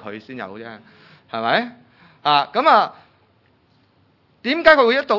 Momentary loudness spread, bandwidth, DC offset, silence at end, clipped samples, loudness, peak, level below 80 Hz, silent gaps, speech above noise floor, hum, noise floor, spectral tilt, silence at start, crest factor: 21 LU; 6 kHz; under 0.1%; 0 s; under 0.1%; -17 LUFS; 0 dBFS; -60 dBFS; none; 40 dB; none; -59 dBFS; -5.5 dB/octave; 0.05 s; 20 dB